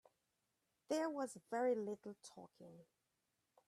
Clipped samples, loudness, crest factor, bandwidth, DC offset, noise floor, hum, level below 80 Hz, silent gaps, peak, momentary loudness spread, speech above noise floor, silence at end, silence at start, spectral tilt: under 0.1%; -43 LUFS; 18 dB; 14 kHz; under 0.1%; -87 dBFS; none; under -90 dBFS; none; -28 dBFS; 21 LU; 44 dB; 0.85 s; 0.9 s; -4.5 dB/octave